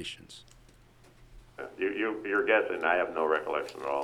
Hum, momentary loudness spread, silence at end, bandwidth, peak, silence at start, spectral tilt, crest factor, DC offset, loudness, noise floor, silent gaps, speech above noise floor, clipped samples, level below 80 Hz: none; 19 LU; 0 s; 13.5 kHz; -10 dBFS; 0 s; -4 dB/octave; 20 dB; under 0.1%; -29 LUFS; -58 dBFS; none; 28 dB; under 0.1%; -62 dBFS